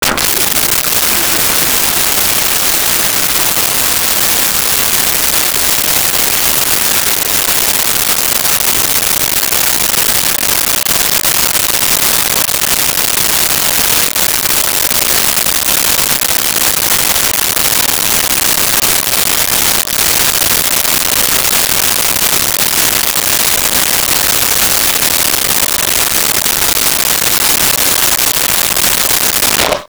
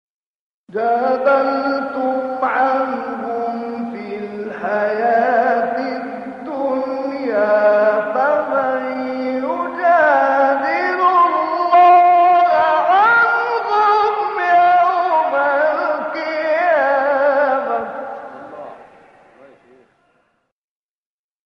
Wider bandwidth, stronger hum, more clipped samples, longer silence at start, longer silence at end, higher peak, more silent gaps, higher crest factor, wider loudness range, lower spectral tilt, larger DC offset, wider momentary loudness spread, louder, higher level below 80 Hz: first, over 20 kHz vs 6.2 kHz; neither; neither; second, 0 s vs 0.75 s; second, 0 s vs 2.6 s; about the same, 0 dBFS vs -2 dBFS; neither; about the same, 10 dB vs 14 dB; second, 0 LU vs 8 LU; second, 0 dB/octave vs -5.5 dB/octave; neither; second, 1 LU vs 14 LU; first, -8 LUFS vs -16 LUFS; first, -36 dBFS vs -68 dBFS